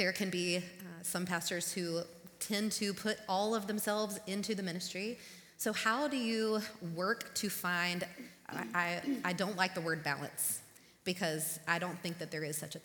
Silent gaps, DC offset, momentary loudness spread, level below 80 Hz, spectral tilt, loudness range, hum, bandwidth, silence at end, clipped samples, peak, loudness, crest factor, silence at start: none; under 0.1%; 8 LU; -76 dBFS; -3.5 dB/octave; 1 LU; none; 19 kHz; 0 s; under 0.1%; -14 dBFS; -36 LUFS; 24 dB; 0 s